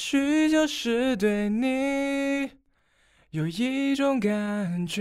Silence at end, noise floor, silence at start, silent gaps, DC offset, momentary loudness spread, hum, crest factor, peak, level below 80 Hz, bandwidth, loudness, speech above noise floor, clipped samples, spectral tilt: 0 s; -66 dBFS; 0 s; none; under 0.1%; 8 LU; none; 14 dB; -10 dBFS; -58 dBFS; 14.5 kHz; -25 LUFS; 41 dB; under 0.1%; -5 dB/octave